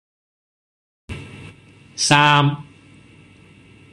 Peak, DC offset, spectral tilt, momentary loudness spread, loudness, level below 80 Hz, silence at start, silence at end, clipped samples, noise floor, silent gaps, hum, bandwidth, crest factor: -2 dBFS; under 0.1%; -3.5 dB/octave; 25 LU; -15 LUFS; -52 dBFS; 1.1 s; 1.3 s; under 0.1%; -48 dBFS; none; none; 12 kHz; 20 dB